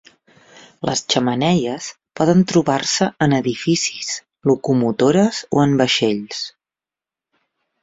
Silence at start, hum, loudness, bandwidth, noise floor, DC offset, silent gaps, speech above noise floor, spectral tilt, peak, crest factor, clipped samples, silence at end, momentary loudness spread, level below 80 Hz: 0.8 s; none; -18 LUFS; 8 kHz; -90 dBFS; under 0.1%; none; 72 dB; -4.5 dB/octave; -2 dBFS; 18 dB; under 0.1%; 1.35 s; 11 LU; -56 dBFS